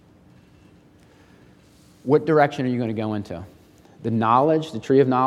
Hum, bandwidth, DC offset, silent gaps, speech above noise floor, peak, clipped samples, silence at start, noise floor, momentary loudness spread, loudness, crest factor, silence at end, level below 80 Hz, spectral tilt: none; 11.5 kHz; under 0.1%; none; 33 dB; -2 dBFS; under 0.1%; 2.05 s; -52 dBFS; 15 LU; -21 LUFS; 20 dB; 0 s; -64 dBFS; -8 dB/octave